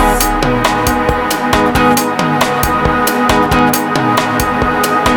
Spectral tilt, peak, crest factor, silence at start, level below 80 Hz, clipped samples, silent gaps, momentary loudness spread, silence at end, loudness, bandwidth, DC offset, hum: -4 dB/octave; 0 dBFS; 12 dB; 0 s; -26 dBFS; under 0.1%; none; 3 LU; 0 s; -12 LUFS; over 20 kHz; under 0.1%; none